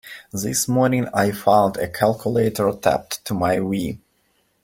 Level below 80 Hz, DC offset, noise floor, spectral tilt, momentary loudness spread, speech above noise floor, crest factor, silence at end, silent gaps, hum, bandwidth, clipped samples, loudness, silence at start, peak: -52 dBFS; under 0.1%; -65 dBFS; -5 dB/octave; 10 LU; 45 dB; 18 dB; 0.65 s; none; none; 17 kHz; under 0.1%; -20 LUFS; 0.05 s; -2 dBFS